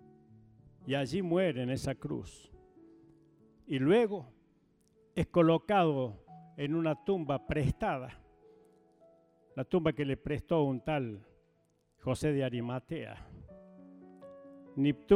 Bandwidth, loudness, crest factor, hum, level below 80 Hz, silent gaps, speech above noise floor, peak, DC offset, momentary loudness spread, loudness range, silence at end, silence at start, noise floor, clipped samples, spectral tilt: 14.5 kHz; -33 LUFS; 22 dB; none; -56 dBFS; none; 41 dB; -12 dBFS; under 0.1%; 24 LU; 6 LU; 0 s; 0.85 s; -73 dBFS; under 0.1%; -7.5 dB/octave